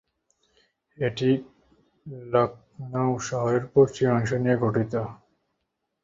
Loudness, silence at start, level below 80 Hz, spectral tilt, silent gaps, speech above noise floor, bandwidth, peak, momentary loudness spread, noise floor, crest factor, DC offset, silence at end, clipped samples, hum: -25 LUFS; 1 s; -60 dBFS; -7 dB/octave; none; 55 dB; 7.8 kHz; -6 dBFS; 12 LU; -79 dBFS; 20 dB; under 0.1%; 0.9 s; under 0.1%; none